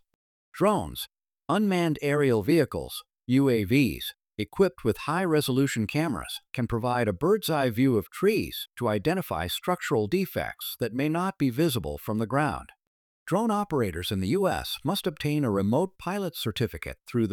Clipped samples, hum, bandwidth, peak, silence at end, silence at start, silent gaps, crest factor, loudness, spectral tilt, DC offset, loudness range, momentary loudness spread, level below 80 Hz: under 0.1%; none; 19.5 kHz; -10 dBFS; 0 s; 0.55 s; 12.87-13.26 s; 16 dB; -27 LUFS; -6 dB/octave; under 0.1%; 3 LU; 10 LU; -52 dBFS